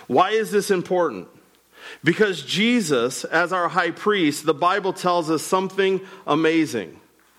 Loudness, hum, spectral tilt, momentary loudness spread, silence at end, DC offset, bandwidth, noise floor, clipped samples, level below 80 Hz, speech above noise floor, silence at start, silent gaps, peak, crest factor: -21 LUFS; none; -4.5 dB/octave; 6 LU; 0.45 s; under 0.1%; 16 kHz; -50 dBFS; under 0.1%; -70 dBFS; 29 dB; 0 s; none; -6 dBFS; 16 dB